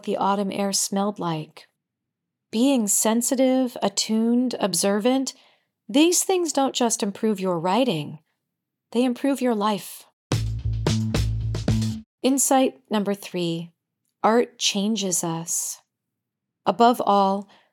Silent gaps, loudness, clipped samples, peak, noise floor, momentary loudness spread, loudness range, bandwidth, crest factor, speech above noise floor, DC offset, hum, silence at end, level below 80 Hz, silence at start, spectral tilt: 10.13-10.30 s, 12.06-12.18 s; -23 LUFS; under 0.1%; -4 dBFS; -83 dBFS; 10 LU; 4 LU; 19 kHz; 18 dB; 61 dB; under 0.1%; none; 0.3 s; -42 dBFS; 0.05 s; -4 dB/octave